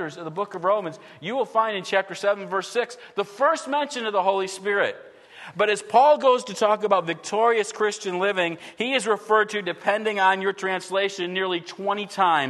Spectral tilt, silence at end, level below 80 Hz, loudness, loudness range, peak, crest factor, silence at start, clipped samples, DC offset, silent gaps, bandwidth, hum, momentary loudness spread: -3.5 dB/octave; 0 s; -78 dBFS; -23 LUFS; 4 LU; -4 dBFS; 18 dB; 0 s; under 0.1%; under 0.1%; none; 12.5 kHz; none; 9 LU